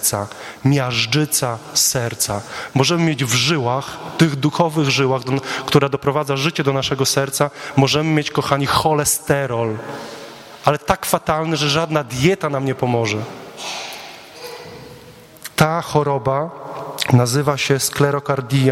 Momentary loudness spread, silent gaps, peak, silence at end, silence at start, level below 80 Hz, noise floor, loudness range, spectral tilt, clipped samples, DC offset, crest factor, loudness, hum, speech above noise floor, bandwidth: 14 LU; none; 0 dBFS; 0 s; 0 s; -48 dBFS; -41 dBFS; 5 LU; -4 dB/octave; under 0.1%; under 0.1%; 18 dB; -18 LUFS; none; 24 dB; 16.5 kHz